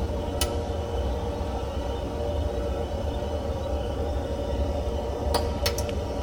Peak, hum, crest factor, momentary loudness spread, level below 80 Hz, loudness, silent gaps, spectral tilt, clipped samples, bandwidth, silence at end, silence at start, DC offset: -8 dBFS; none; 18 dB; 4 LU; -32 dBFS; -29 LUFS; none; -5.5 dB/octave; under 0.1%; 16.5 kHz; 0 s; 0 s; 0.1%